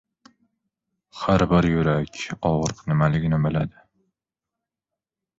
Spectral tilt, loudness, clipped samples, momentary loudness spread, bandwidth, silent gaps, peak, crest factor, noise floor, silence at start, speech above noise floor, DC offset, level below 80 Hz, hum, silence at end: -7 dB/octave; -22 LUFS; under 0.1%; 9 LU; 7.8 kHz; none; -6 dBFS; 18 dB; -87 dBFS; 1.15 s; 66 dB; under 0.1%; -44 dBFS; none; 1.7 s